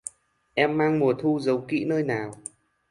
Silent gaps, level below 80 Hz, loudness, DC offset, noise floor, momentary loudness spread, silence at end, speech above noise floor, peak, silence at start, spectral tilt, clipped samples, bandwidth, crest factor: none; -66 dBFS; -25 LUFS; under 0.1%; -56 dBFS; 16 LU; 0.55 s; 33 dB; -6 dBFS; 0.05 s; -6 dB/octave; under 0.1%; 11.5 kHz; 20 dB